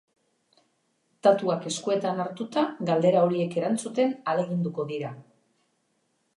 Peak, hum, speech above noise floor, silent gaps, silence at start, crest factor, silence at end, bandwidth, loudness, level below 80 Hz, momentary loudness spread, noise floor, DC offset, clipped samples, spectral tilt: -8 dBFS; none; 47 dB; none; 1.25 s; 20 dB; 1.15 s; 11.5 kHz; -26 LUFS; -80 dBFS; 9 LU; -72 dBFS; under 0.1%; under 0.1%; -6 dB/octave